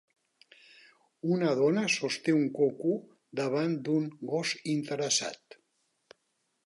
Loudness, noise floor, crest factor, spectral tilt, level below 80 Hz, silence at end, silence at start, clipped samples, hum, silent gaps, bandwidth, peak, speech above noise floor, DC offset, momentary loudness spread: -30 LUFS; -78 dBFS; 16 dB; -4.5 dB/octave; -84 dBFS; 1.3 s; 1.25 s; under 0.1%; none; none; 11.5 kHz; -14 dBFS; 48 dB; under 0.1%; 10 LU